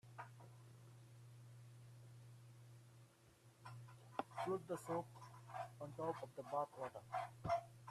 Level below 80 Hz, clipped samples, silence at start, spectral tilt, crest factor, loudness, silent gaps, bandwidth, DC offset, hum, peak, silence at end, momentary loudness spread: -80 dBFS; under 0.1%; 0.05 s; -6 dB/octave; 24 dB; -48 LUFS; none; 14 kHz; under 0.1%; none; -26 dBFS; 0 s; 18 LU